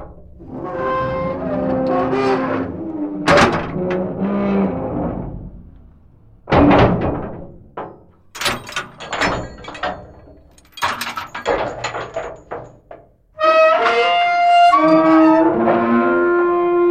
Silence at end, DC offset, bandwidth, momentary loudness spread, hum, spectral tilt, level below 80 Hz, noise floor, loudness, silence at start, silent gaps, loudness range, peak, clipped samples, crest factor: 0 s; under 0.1%; 15.5 kHz; 20 LU; none; -6 dB/octave; -38 dBFS; -46 dBFS; -16 LUFS; 0 s; none; 12 LU; -2 dBFS; under 0.1%; 16 dB